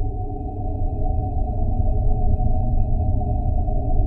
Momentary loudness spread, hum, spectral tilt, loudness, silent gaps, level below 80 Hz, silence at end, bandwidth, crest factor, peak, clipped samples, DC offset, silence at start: 6 LU; none; -14 dB/octave; -25 LUFS; none; -20 dBFS; 0 s; 0.9 kHz; 14 dB; -6 dBFS; under 0.1%; under 0.1%; 0 s